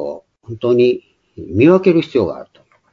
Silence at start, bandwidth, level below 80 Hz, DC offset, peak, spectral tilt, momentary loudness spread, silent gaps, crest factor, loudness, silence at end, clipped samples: 0 s; 6.4 kHz; -52 dBFS; under 0.1%; 0 dBFS; -8.5 dB/octave; 22 LU; none; 16 dB; -15 LUFS; 0.5 s; under 0.1%